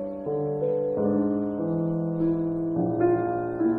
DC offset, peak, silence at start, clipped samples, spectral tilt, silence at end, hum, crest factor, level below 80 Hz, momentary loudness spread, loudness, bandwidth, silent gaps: under 0.1%; -12 dBFS; 0 s; under 0.1%; -12.5 dB/octave; 0 s; none; 14 dB; -56 dBFS; 4 LU; -26 LUFS; 2.6 kHz; none